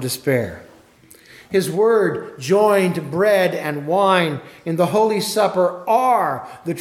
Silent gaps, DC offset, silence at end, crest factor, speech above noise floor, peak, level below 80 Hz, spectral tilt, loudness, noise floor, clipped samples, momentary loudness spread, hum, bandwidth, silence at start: none; under 0.1%; 0 s; 16 dB; 30 dB; -2 dBFS; -60 dBFS; -5 dB/octave; -18 LUFS; -48 dBFS; under 0.1%; 9 LU; none; 17 kHz; 0 s